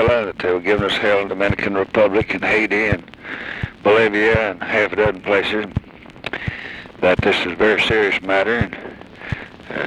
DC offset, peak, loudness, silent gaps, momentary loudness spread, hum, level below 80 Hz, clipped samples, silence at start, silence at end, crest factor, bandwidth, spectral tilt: under 0.1%; -2 dBFS; -18 LUFS; none; 14 LU; none; -40 dBFS; under 0.1%; 0 s; 0 s; 16 dB; 11 kHz; -6 dB/octave